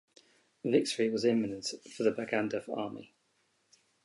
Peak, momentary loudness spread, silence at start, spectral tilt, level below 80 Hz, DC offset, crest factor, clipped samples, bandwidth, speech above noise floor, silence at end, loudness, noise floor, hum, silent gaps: -14 dBFS; 11 LU; 0.65 s; -4.5 dB/octave; -76 dBFS; under 0.1%; 20 dB; under 0.1%; 11.5 kHz; 43 dB; 1 s; -32 LUFS; -74 dBFS; none; none